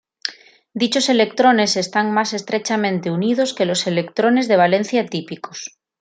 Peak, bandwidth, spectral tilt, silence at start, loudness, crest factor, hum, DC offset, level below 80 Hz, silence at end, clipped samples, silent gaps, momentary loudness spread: -2 dBFS; 9.4 kHz; -4 dB/octave; 0.25 s; -18 LUFS; 16 dB; none; under 0.1%; -68 dBFS; 0.35 s; under 0.1%; none; 15 LU